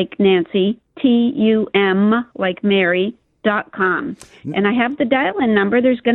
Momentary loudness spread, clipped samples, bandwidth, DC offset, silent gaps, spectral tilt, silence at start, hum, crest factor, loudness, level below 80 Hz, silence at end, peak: 7 LU; under 0.1%; 9 kHz; under 0.1%; none; -7.5 dB/octave; 0 s; none; 16 dB; -17 LUFS; -56 dBFS; 0 s; -2 dBFS